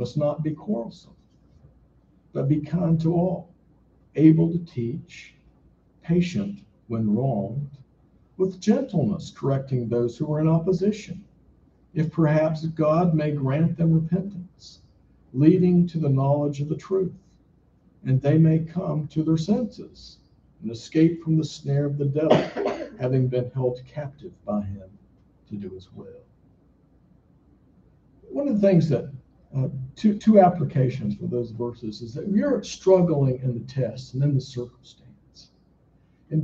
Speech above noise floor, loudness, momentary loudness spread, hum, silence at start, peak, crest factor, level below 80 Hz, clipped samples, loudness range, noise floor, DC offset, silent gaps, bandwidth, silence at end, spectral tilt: 37 dB; -23 LUFS; 17 LU; none; 0 s; -2 dBFS; 22 dB; -56 dBFS; under 0.1%; 7 LU; -59 dBFS; under 0.1%; none; 7.4 kHz; 0 s; -8.5 dB/octave